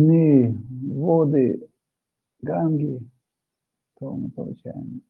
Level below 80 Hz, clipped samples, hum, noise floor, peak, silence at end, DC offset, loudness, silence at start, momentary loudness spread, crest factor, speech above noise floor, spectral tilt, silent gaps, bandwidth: -66 dBFS; under 0.1%; none; -84 dBFS; -6 dBFS; 0.1 s; under 0.1%; -22 LUFS; 0 s; 18 LU; 18 dB; 61 dB; -13.5 dB/octave; none; 2.8 kHz